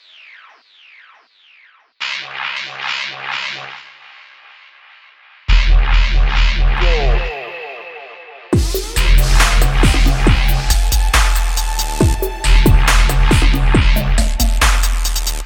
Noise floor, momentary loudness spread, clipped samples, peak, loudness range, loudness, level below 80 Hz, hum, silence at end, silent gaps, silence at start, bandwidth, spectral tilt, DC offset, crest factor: -49 dBFS; 13 LU; under 0.1%; 0 dBFS; 9 LU; -16 LUFS; -14 dBFS; none; 0 s; none; 2 s; 17.5 kHz; -4 dB/octave; under 0.1%; 14 dB